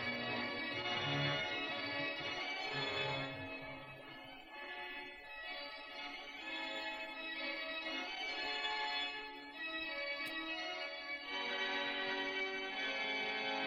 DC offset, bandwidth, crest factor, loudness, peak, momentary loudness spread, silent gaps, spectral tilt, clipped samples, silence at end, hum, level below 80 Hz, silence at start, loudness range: under 0.1%; 16 kHz; 18 dB; -40 LUFS; -24 dBFS; 10 LU; none; -4 dB/octave; under 0.1%; 0 s; none; -72 dBFS; 0 s; 6 LU